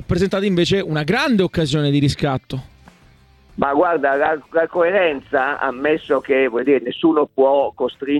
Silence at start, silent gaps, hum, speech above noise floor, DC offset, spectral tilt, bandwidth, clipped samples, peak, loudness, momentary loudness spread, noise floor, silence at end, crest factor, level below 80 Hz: 0 s; none; none; 33 dB; under 0.1%; -6.5 dB/octave; 13 kHz; under 0.1%; -2 dBFS; -18 LUFS; 6 LU; -50 dBFS; 0 s; 16 dB; -44 dBFS